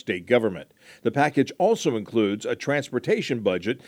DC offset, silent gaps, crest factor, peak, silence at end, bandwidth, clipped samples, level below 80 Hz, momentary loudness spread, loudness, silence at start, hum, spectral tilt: under 0.1%; none; 20 dB; -4 dBFS; 0.1 s; 16 kHz; under 0.1%; -68 dBFS; 6 LU; -24 LUFS; 0.05 s; none; -5.5 dB/octave